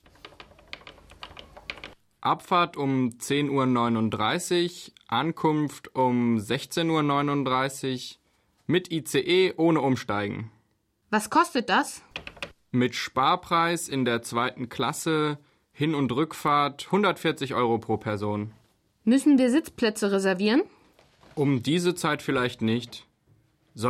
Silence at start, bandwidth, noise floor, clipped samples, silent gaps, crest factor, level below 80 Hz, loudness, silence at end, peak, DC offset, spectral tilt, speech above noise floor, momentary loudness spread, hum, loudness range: 0.25 s; 16 kHz; -70 dBFS; under 0.1%; none; 16 dB; -62 dBFS; -25 LUFS; 0 s; -10 dBFS; under 0.1%; -5 dB/octave; 45 dB; 16 LU; none; 2 LU